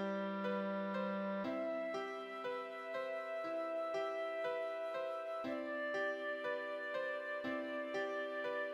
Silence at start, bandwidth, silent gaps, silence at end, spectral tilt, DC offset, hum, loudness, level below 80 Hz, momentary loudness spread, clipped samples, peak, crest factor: 0 s; 12.5 kHz; none; 0 s; -6 dB/octave; under 0.1%; none; -41 LUFS; -88 dBFS; 3 LU; under 0.1%; -28 dBFS; 12 dB